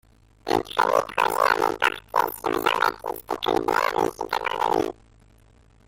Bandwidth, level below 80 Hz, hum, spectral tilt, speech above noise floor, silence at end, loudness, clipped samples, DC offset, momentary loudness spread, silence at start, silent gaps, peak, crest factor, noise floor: 17 kHz; -54 dBFS; none; -3.5 dB/octave; 30 dB; 0.95 s; -24 LUFS; under 0.1%; under 0.1%; 6 LU; 0.45 s; none; -6 dBFS; 20 dB; -55 dBFS